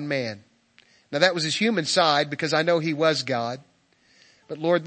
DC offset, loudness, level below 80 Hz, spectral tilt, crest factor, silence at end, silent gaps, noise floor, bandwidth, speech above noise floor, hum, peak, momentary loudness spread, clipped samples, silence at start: under 0.1%; -23 LUFS; -76 dBFS; -4 dB/octave; 22 dB; 0 s; none; -62 dBFS; 8.8 kHz; 38 dB; none; -2 dBFS; 13 LU; under 0.1%; 0 s